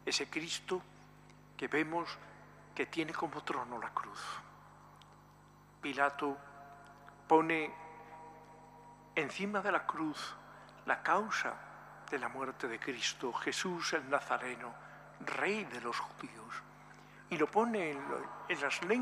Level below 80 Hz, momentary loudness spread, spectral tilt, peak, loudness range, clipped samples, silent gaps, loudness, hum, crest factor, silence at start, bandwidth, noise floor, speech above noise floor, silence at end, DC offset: -74 dBFS; 22 LU; -3.5 dB/octave; -14 dBFS; 5 LU; under 0.1%; none; -37 LUFS; 50 Hz at -65 dBFS; 24 dB; 0 s; 15 kHz; -61 dBFS; 24 dB; 0 s; under 0.1%